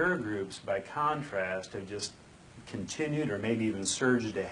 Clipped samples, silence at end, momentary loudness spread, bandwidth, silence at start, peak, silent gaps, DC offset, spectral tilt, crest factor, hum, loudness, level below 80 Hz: under 0.1%; 0 s; 11 LU; 11 kHz; 0 s; -14 dBFS; none; under 0.1%; -4.5 dB/octave; 18 dB; none; -33 LUFS; -64 dBFS